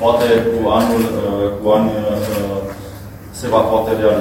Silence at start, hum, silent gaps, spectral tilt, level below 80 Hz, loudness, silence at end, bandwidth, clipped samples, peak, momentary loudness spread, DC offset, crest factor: 0 s; none; none; -6 dB/octave; -38 dBFS; -16 LUFS; 0 s; 17 kHz; under 0.1%; 0 dBFS; 15 LU; under 0.1%; 16 dB